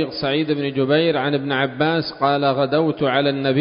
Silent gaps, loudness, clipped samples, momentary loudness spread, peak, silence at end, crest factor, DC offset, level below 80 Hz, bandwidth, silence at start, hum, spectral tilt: none; -19 LUFS; under 0.1%; 4 LU; -4 dBFS; 0 s; 16 dB; under 0.1%; -58 dBFS; 5.4 kHz; 0 s; none; -11 dB/octave